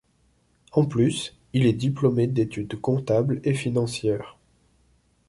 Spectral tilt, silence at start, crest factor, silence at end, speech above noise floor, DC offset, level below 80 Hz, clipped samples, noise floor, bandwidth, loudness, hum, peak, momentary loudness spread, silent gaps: -7 dB/octave; 0.75 s; 18 dB; 1 s; 42 dB; under 0.1%; -56 dBFS; under 0.1%; -65 dBFS; 11.5 kHz; -24 LUFS; none; -6 dBFS; 7 LU; none